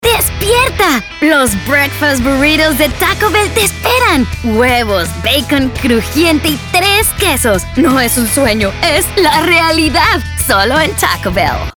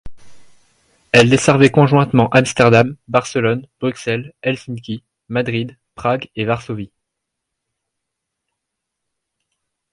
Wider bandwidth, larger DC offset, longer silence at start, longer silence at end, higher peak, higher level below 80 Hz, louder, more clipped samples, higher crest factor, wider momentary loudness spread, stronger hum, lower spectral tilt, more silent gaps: first, over 20 kHz vs 11.5 kHz; neither; about the same, 0 s vs 0.05 s; second, 0.05 s vs 3.05 s; about the same, 0 dBFS vs 0 dBFS; first, -26 dBFS vs -48 dBFS; first, -10 LUFS vs -15 LUFS; neither; second, 12 dB vs 18 dB; second, 4 LU vs 16 LU; neither; second, -3.5 dB/octave vs -5.5 dB/octave; neither